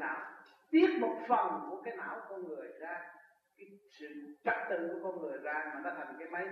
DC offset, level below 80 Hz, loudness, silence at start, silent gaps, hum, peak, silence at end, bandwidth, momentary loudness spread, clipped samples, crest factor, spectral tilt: under 0.1%; -86 dBFS; -36 LUFS; 0 s; none; none; -16 dBFS; 0 s; 6 kHz; 19 LU; under 0.1%; 22 dB; -6.5 dB/octave